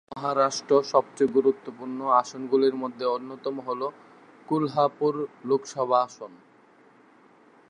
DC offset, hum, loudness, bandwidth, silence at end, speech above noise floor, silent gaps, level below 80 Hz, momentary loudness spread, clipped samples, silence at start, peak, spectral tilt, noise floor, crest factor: under 0.1%; none; -26 LUFS; 9.8 kHz; 1.35 s; 31 dB; none; -78 dBFS; 11 LU; under 0.1%; 0.1 s; -6 dBFS; -5.5 dB/octave; -57 dBFS; 20 dB